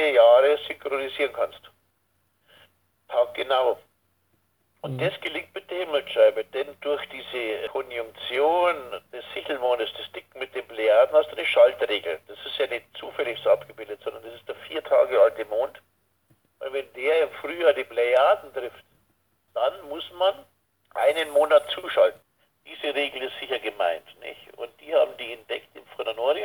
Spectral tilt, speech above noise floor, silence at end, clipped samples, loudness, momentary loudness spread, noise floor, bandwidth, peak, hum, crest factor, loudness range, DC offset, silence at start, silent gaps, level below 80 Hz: -4.5 dB/octave; 47 dB; 0 s; under 0.1%; -24 LUFS; 17 LU; -71 dBFS; 19.5 kHz; -6 dBFS; none; 20 dB; 5 LU; under 0.1%; 0 s; none; -74 dBFS